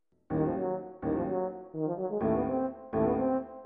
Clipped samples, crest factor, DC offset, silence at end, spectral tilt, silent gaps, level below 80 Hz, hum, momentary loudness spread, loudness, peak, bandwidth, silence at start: under 0.1%; 16 dB; under 0.1%; 0 s; -10.5 dB/octave; none; -54 dBFS; none; 7 LU; -32 LUFS; -16 dBFS; 3.5 kHz; 0.3 s